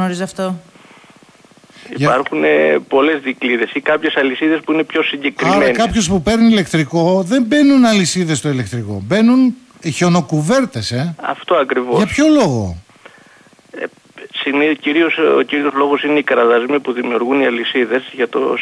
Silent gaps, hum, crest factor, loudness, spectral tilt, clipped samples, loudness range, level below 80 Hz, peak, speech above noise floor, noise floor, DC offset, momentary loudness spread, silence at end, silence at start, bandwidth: none; none; 12 dB; -14 LUFS; -5 dB/octave; under 0.1%; 4 LU; -44 dBFS; -2 dBFS; 32 dB; -46 dBFS; under 0.1%; 10 LU; 0 s; 0 s; 11 kHz